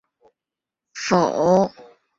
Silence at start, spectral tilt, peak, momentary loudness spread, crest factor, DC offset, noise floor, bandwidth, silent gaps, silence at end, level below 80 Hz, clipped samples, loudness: 0.95 s; -5.5 dB/octave; -4 dBFS; 12 LU; 20 dB; under 0.1%; -87 dBFS; 7.8 kHz; none; 0.35 s; -60 dBFS; under 0.1%; -20 LUFS